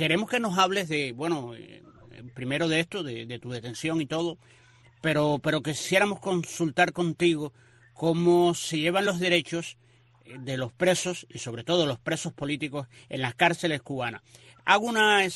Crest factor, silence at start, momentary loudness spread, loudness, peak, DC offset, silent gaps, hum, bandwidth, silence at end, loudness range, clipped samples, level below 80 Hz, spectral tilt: 22 dB; 0 s; 14 LU; -27 LUFS; -6 dBFS; under 0.1%; none; none; 13 kHz; 0 s; 5 LU; under 0.1%; -64 dBFS; -4.5 dB/octave